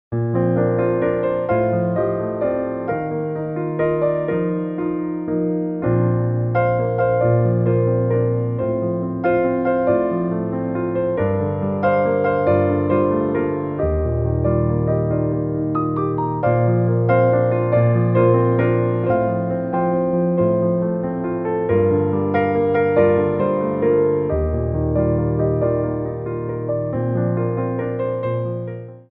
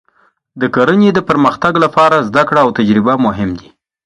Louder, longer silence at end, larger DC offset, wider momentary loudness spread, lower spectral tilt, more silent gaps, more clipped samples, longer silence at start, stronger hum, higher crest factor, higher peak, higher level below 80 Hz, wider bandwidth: second, -19 LUFS vs -11 LUFS; second, 0.1 s vs 0.45 s; neither; second, 6 LU vs 9 LU; first, -9.5 dB/octave vs -7 dB/octave; neither; neither; second, 0.1 s vs 0.55 s; neither; about the same, 16 dB vs 12 dB; second, -4 dBFS vs 0 dBFS; first, -38 dBFS vs -44 dBFS; second, 3.8 kHz vs 10.5 kHz